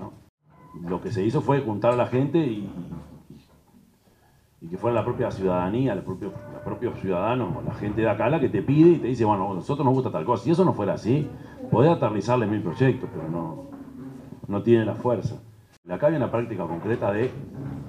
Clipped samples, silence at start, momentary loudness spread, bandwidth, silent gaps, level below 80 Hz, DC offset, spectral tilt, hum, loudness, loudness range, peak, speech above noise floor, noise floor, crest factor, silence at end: under 0.1%; 0 s; 16 LU; 10 kHz; 0.29-0.38 s, 15.77-15.83 s; -54 dBFS; under 0.1%; -8.5 dB/octave; none; -24 LUFS; 6 LU; -6 dBFS; 35 dB; -59 dBFS; 18 dB; 0 s